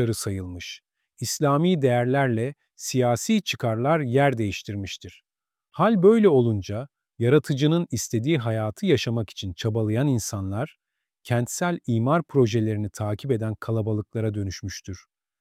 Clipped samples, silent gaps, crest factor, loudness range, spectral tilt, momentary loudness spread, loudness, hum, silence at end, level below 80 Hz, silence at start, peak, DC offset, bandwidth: under 0.1%; none; 18 dB; 4 LU; -6 dB/octave; 14 LU; -24 LUFS; none; 0.45 s; -58 dBFS; 0 s; -6 dBFS; under 0.1%; 16 kHz